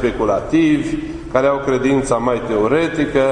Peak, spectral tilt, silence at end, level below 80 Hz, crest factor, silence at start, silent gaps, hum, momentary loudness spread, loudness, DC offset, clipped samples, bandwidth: 0 dBFS; -6 dB/octave; 0 s; -36 dBFS; 16 dB; 0 s; none; none; 4 LU; -17 LUFS; under 0.1%; under 0.1%; 10.5 kHz